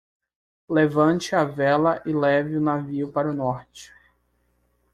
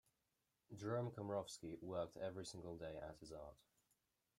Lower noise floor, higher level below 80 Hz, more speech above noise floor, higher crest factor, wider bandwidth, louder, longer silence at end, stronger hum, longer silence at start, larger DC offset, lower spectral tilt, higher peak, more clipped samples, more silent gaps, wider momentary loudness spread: second, -68 dBFS vs -89 dBFS; first, -60 dBFS vs -74 dBFS; first, 46 dB vs 40 dB; about the same, 18 dB vs 20 dB; second, 11.5 kHz vs 15.5 kHz; first, -22 LUFS vs -50 LUFS; first, 1.05 s vs 0.85 s; first, 60 Hz at -55 dBFS vs none; about the same, 0.7 s vs 0.7 s; neither; about the same, -6.5 dB/octave vs -5.5 dB/octave; first, -6 dBFS vs -32 dBFS; neither; neither; second, 7 LU vs 11 LU